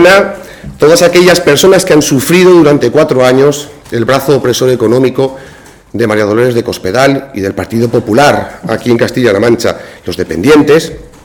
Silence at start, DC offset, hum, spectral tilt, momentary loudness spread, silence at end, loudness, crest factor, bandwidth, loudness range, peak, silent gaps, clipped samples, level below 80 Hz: 0 s; under 0.1%; none; -5 dB/octave; 12 LU; 0.15 s; -8 LUFS; 8 dB; over 20 kHz; 5 LU; 0 dBFS; none; 2%; -38 dBFS